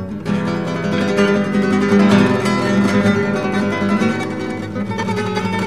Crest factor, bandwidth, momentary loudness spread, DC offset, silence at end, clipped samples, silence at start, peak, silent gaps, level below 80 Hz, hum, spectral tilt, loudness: 16 dB; 12 kHz; 9 LU; 0.7%; 0 s; under 0.1%; 0 s; 0 dBFS; none; -48 dBFS; none; -6.5 dB/octave; -17 LUFS